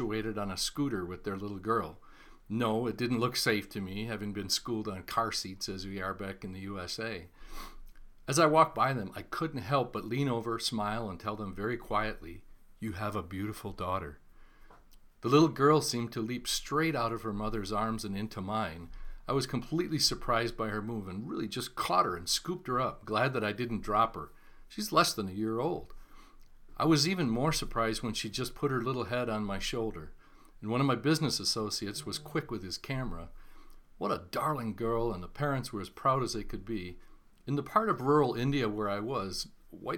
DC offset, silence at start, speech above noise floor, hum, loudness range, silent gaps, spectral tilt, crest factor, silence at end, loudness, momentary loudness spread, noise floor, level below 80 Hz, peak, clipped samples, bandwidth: under 0.1%; 0 s; 24 dB; none; 6 LU; none; -4.5 dB/octave; 22 dB; 0 s; -32 LUFS; 12 LU; -56 dBFS; -50 dBFS; -10 dBFS; under 0.1%; 19 kHz